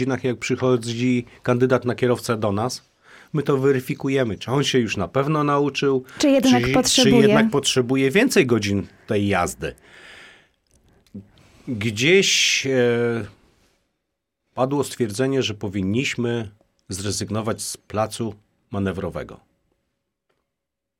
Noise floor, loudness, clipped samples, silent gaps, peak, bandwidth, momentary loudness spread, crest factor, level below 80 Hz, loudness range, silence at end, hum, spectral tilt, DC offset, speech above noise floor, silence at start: -82 dBFS; -20 LUFS; under 0.1%; none; -4 dBFS; 16.5 kHz; 14 LU; 18 dB; -52 dBFS; 10 LU; 1.65 s; none; -4.5 dB/octave; under 0.1%; 62 dB; 0 s